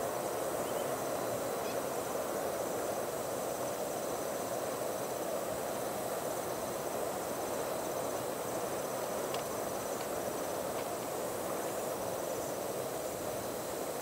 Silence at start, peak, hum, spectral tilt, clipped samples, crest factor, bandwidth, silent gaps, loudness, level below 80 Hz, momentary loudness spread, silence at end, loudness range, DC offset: 0 s; -22 dBFS; none; -3.5 dB/octave; under 0.1%; 14 dB; 16 kHz; none; -37 LUFS; -66 dBFS; 2 LU; 0 s; 1 LU; under 0.1%